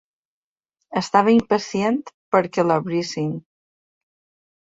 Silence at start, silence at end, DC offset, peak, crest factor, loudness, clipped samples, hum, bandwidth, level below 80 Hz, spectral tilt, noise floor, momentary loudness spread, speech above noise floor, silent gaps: 0.9 s; 1.35 s; under 0.1%; -2 dBFS; 22 dB; -21 LUFS; under 0.1%; none; 7.8 kHz; -62 dBFS; -6 dB/octave; -79 dBFS; 11 LU; 60 dB; 2.14-2.32 s